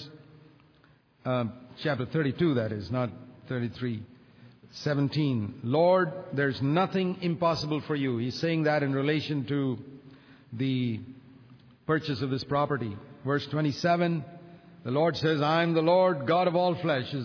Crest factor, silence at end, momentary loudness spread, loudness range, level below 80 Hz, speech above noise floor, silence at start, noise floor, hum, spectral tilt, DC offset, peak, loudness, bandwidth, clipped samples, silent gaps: 16 dB; 0 s; 13 LU; 5 LU; -66 dBFS; 34 dB; 0 s; -61 dBFS; none; -7.5 dB/octave; under 0.1%; -12 dBFS; -28 LUFS; 5.4 kHz; under 0.1%; none